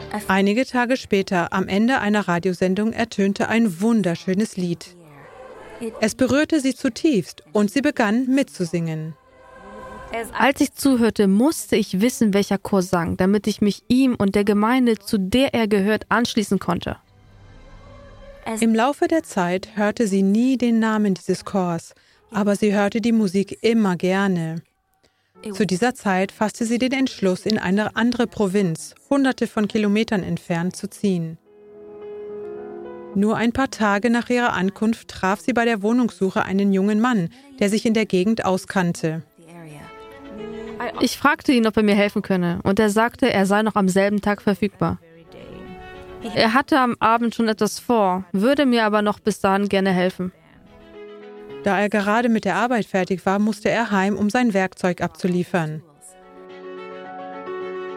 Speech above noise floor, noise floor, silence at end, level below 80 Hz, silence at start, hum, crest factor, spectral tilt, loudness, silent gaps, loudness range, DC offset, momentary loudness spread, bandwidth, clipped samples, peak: 44 dB; -64 dBFS; 0 s; -52 dBFS; 0 s; none; 20 dB; -5.5 dB/octave; -20 LUFS; none; 4 LU; under 0.1%; 16 LU; 16 kHz; under 0.1%; -2 dBFS